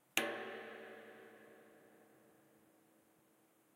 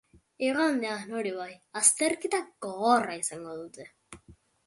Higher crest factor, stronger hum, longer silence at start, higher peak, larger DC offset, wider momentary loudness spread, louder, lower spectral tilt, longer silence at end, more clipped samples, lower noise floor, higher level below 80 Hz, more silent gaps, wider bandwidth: first, 36 dB vs 22 dB; neither; second, 0.15 s vs 0.4 s; second, -12 dBFS vs -8 dBFS; neither; first, 28 LU vs 18 LU; second, -45 LUFS vs -28 LUFS; about the same, -1 dB/octave vs -2 dB/octave; first, 1 s vs 0.35 s; neither; first, -73 dBFS vs -58 dBFS; second, under -90 dBFS vs -70 dBFS; neither; first, 16 kHz vs 12 kHz